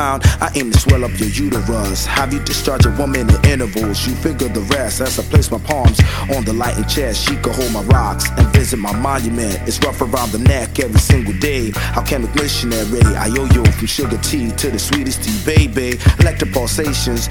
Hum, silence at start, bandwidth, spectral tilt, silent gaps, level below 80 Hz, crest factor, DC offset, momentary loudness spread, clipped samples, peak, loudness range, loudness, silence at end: none; 0 s; 18.5 kHz; -5 dB/octave; none; -20 dBFS; 14 dB; under 0.1%; 6 LU; under 0.1%; 0 dBFS; 1 LU; -15 LUFS; 0 s